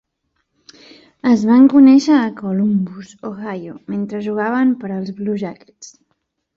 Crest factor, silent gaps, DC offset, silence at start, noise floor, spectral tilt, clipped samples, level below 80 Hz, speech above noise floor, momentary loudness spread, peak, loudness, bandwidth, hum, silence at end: 14 dB; none; under 0.1%; 1.25 s; -70 dBFS; -7 dB/octave; under 0.1%; -60 dBFS; 55 dB; 19 LU; -2 dBFS; -15 LUFS; 7.4 kHz; none; 0.7 s